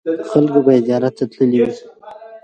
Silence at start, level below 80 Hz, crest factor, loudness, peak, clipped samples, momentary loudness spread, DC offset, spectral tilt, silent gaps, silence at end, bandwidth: 0.05 s; -60 dBFS; 16 dB; -15 LUFS; 0 dBFS; under 0.1%; 7 LU; under 0.1%; -8.5 dB/octave; none; 0.05 s; 8.8 kHz